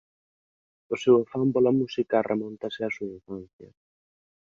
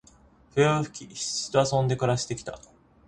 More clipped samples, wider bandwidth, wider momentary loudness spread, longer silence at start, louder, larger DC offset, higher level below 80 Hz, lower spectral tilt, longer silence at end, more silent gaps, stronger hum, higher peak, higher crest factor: neither; second, 7.4 kHz vs 11 kHz; first, 16 LU vs 12 LU; first, 0.9 s vs 0.55 s; about the same, -25 LUFS vs -26 LUFS; neither; second, -66 dBFS vs -56 dBFS; first, -7 dB/octave vs -4.5 dB/octave; first, 0.95 s vs 0.5 s; first, 3.53-3.59 s vs none; neither; about the same, -8 dBFS vs -8 dBFS; about the same, 20 dB vs 20 dB